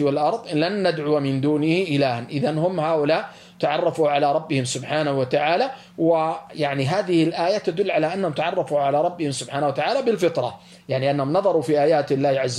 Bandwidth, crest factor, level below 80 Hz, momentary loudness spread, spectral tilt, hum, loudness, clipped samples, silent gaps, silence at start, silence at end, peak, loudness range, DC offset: 12.5 kHz; 14 dB; -66 dBFS; 5 LU; -5.5 dB/octave; none; -22 LUFS; under 0.1%; none; 0 s; 0 s; -8 dBFS; 1 LU; under 0.1%